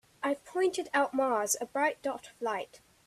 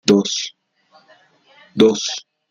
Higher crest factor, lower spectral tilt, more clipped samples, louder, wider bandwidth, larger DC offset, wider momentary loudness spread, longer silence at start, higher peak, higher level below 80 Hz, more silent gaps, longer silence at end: about the same, 16 dB vs 20 dB; second, -2 dB/octave vs -4 dB/octave; neither; second, -31 LUFS vs -18 LUFS; first, 14 kHz vs 9.4 kHz; neither; second, 9 LU vs 15 LU; first, 0.2 s vs 0.05 s; second, -16 dBFS vs 0 dBFS; second, -76 dBFS vs -58 dBFS; neither; about the same, 0.3 s vs 0.3 s